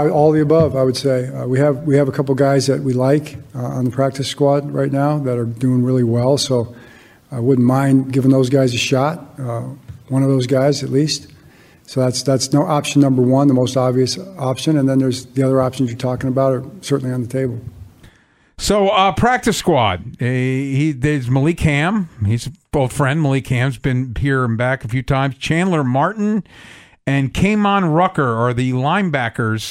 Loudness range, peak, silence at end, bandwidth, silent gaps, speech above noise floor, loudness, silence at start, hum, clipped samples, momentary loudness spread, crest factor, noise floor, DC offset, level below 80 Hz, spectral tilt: 3 LU; -2 dBFS; 0 s; 14.5 kHz; none; 36 dB; -17 LUFS; 0 s; none; under 0.1%; 8 LU; 14 dB; -52 dBFS; under 0.1%; -42 dBFS; -6 dB/octave